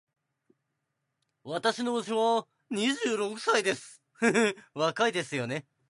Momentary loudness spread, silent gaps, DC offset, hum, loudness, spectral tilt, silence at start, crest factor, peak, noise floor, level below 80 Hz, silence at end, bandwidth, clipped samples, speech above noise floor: 7 LU; none; under 0.1%; none; -29 LUFS; -3.5 dB/octave; 1.45 s; 18 dB; -12 dBFS; -82 dBFS; -80 dBFS; 0.3 s; 11.5 kHz; under 0.1%; 53 dB